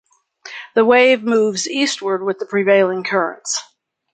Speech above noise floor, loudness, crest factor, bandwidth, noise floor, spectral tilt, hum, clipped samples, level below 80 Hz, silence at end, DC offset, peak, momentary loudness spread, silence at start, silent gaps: 25 dB; -16 LUFS; 16 dB; 9.4 kHz; -41 dBFS; -3 dB/octave; none; under 0.1%; -70 dBFS; 0.5 s; under 0.1%; -2 dBFS; 11 LU; 0.45 s; none